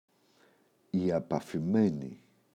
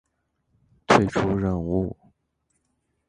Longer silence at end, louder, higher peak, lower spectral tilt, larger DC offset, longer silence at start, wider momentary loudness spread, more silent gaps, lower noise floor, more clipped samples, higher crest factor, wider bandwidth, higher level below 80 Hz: second, 0.4 s vs 1.15 s; second, -31 LUFS vs -23 LUFS; second, -16 dBFS vs -2 dBFS; first, -8.5 dB/octave vs -6 dB/octave; neither; about the same, 0.95 s vs 0.9 s; first, 11 LU vs 8 LU; neither; second, -67 dBFS vs -74 dBFS; neither; second, 18 dB vs 24 dB; about the same, 10 kHz vs 10.5 kHz; second, -66 dBFS vs -44 dBFS